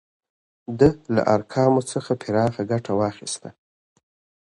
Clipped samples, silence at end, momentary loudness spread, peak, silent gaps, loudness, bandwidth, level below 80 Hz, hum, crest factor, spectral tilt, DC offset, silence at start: under 0.1%; 0.9 s; 12 LU; -2 dBFS; none; -22 LUFS; 11.5 kHz; -50 dBFS; none; 20 dB; -6.5 dB/octave; under 0.1%; 0.7 s